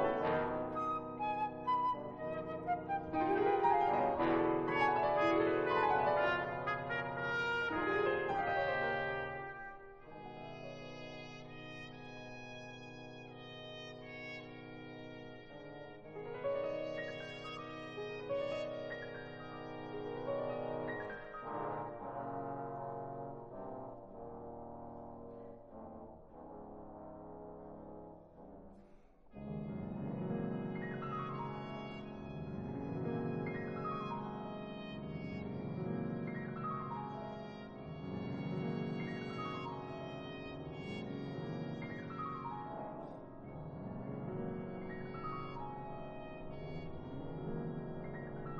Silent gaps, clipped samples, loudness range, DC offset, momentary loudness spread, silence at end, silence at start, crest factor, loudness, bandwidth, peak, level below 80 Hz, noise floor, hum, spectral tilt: none; under 0.1%; 16 LU; under 0.1%; 18 LU; 0 s; 0 s; 20 dB; -40 LUFS; 8.2 kHz; -20 dBFS; -62 dBFS; -61 dBFS; none; -7.5 dB/octave